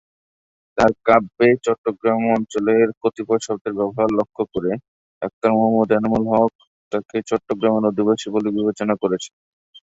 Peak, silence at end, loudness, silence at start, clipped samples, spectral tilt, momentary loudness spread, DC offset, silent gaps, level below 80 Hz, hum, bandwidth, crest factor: -2 dBFS; 0.1 s; -19 LUFS; 0.75 s; under 0.1%; -6 dB/octave; 9 LU; under 0.1%; 1.78-1.84 s, 2.97-3.01 s, 3.61-3.65 s, 4.88-5.21 s, 5.33-5.41 s, 6.55-6.59 s, 6.67-6.91 s, 9.33-9.73 s; -54 dBFS; none; 8 kHz; 18 dB